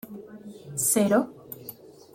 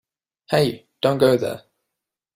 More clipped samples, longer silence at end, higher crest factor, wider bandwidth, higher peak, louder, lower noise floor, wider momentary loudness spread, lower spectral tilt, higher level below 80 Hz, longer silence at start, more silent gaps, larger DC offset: neither; second, 0.25 s vs 0.8 s; about the same, 18 dB vs 20 dB; about the same, 16.5 kHz vs 15.5 kHz; second, -10 dBFS vs -4 dBFS; second, -24 LUFS vs -21 LUFS; second, -46 dBFS vs -83 dBFS; first, 22 LU vs 10 LU; second, -4 dB/octave vs -6 dB/octave; second, -68 dBFS vs -58 dBFS; second, 0.05 s vs 0.5 s; neither; neither